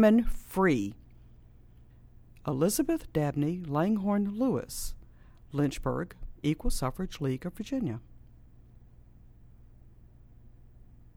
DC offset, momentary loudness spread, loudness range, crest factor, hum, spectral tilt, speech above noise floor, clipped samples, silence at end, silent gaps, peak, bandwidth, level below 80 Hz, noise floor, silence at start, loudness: under 0.1%; 11 LU; 9 LU; 22 dB; none; -6 dB/octave; 26 dB; under 0.1%; 0.65 s; none; -10 dBFS; 18.5 kHz; -42 dBFS; -54 dBFS; 0 s; -31 LUFS